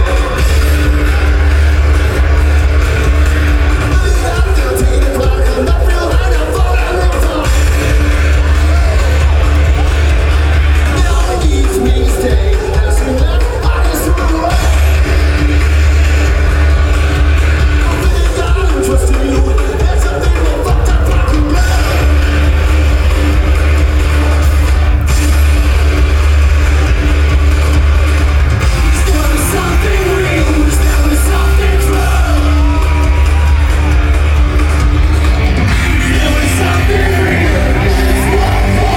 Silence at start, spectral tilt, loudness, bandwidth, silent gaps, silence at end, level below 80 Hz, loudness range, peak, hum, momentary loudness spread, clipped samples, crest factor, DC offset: 0 s; -5.5 dB/octave; -11 LUFS; 15.5 kHz; none; 0 s; -10 dBFS; 1 LU; -2 dBFS; none; 2 LU; under 0.1%; 8 dB; under 0.1%